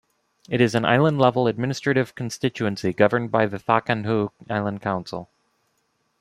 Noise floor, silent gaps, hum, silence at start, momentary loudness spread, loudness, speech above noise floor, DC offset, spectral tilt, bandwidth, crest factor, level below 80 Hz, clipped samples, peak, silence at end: -70 dBFS; none; none; 0.5 s; 9 LU; -22 LUFS; 48 dB; under 0.1%; -6.5 dB/octave; 13.5 kHz; 20 dB; -62 dBFS; under 0.1%; -2 dBFS; 0.95 s